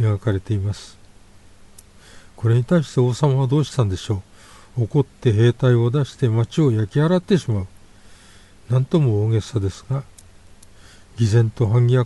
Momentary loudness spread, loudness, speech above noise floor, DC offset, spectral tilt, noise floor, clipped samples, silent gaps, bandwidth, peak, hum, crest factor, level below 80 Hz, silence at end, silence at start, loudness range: 10 LU; -20 LUFS; 28 dB; under 0.1%; -7.5 dB/octave; -46 dBFS; under 0.1%; none; 11.5 kHz; -4 dBFS; none; 16 dB; -48 dBFS; 0 s; 0 s; 4 LU